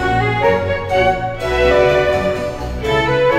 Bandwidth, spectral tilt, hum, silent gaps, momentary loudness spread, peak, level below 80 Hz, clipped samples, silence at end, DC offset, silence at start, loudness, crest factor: 15.5 kHz; -6 dB/octave; none; none; 8 LU; -2 dBFS; -30 dBFS; under 0.1%; 0 s; 0.1%; 0 s; -16 LUFS; 14 dB